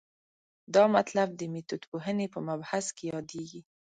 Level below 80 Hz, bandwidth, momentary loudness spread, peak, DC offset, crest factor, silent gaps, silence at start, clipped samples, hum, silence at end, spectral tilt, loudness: -74 dBFS; 9.4 kHz; 14 LU; -10 dBFS; under 0.1%; 20 dB; 1.87-1.92 s; 0.7 s; under 0.1%; none; 0.25 s; -5 dB/octave; -30 LUFS